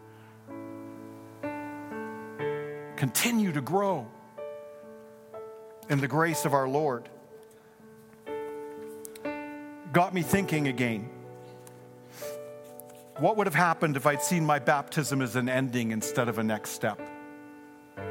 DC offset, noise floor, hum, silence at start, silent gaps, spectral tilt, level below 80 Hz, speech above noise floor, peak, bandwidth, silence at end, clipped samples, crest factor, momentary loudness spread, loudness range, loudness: under 0.1%; -53 dBFS; none; 0 s; none; -5 dB/octave; -68 dBFS; 26 dB; -8 dBFS; 17 kHz; 0 s; under 0.1%; 24 dB; 21 LU; 6 LU; -29 LUFS